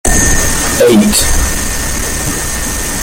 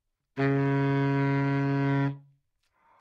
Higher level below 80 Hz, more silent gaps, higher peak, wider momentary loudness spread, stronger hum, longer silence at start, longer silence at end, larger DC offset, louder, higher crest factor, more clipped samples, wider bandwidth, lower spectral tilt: first, -18 dBFS vs -66 dBFS; neither; first, 0 dBFS vs -16 dBFS; about the same, 8 LU vs 7 LU; neither; second, 0.05 s vs 0.35 s; second, 0 s vs 0.8 s; neither; first, -11 LUFS vs -27 LUFS; about the same, 10 dB vs 10 dB; neither; first, 17.5 kHz vs 5.6 kHz; second, -3 dB/octave vs -9.5 dB/octave